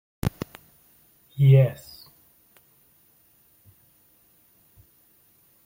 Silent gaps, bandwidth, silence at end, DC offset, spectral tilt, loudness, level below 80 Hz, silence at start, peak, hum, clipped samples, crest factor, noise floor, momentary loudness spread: none; 16.5 kHz; 3.9 s; under 0.1%; -8.5 dB/octave; -21 LUFS; -54 dBFS; 0.25 s; -6 dBFS; none; under 0.1%; 22 dB; -60 dBFS; 27 LU